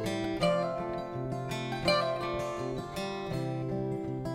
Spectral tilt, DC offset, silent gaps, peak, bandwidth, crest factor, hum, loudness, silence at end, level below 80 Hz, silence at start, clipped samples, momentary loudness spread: -6 dB/octave; under 0.1%; none; -14 dBFS; 16 kHz; 20 dB; none; -33 LUFS; 0 s; -54 dBFS; 0 s; under 0.1%; 8 LU